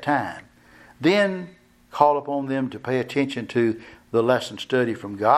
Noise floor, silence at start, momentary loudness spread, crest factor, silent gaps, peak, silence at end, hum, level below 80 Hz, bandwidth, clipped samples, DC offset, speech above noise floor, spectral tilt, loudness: -51 dBFS; 0 s; 14 LU; 20 dB; none; -2 dBFS; 0 s; none; -64 dBFS; 13.5 kHz; under 0.1%; under 0.1%; 29 dB; -6 dB/octave; -23 LUFS